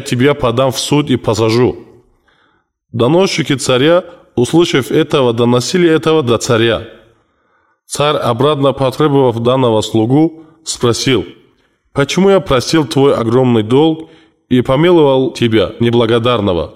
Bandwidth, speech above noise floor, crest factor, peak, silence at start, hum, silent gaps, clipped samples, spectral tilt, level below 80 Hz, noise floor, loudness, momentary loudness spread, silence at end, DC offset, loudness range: 15.5 kHz; 46 dB; 10 dB; -2 dBFS; 0 s; none; none; under 0.1%; -5.5 dB/octave; -42 dBFS; -58 dBFS; -12 LUFS; 6 LU; 0.05 s; 0.2%; 3 LU